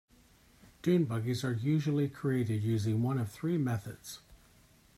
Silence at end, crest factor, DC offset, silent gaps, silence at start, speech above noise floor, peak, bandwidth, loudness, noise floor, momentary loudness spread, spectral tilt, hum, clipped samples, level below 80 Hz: 0.65 s; 16 dB; under 0.1%; none; 0.85 s; 31 dB; -18 dBFS; 15 kHz; -32 LUFS; -63 dBFS; 11 LU; -7.5 dB/octave; none; under 0.1%; -66 dBFS